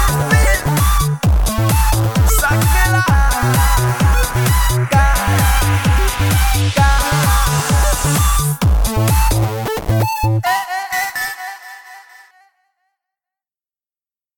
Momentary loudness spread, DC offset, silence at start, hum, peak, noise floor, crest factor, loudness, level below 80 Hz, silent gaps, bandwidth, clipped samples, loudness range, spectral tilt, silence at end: 6 LU; under 0.1%; 0 s; none; 0 dBFS; under -90 dBFS; 14 dB; -15 LUFS; -18 dBFS; none; 17.5 kHz; under 0.1%; 8 LU; -4.5 dB/octave; 2.4 s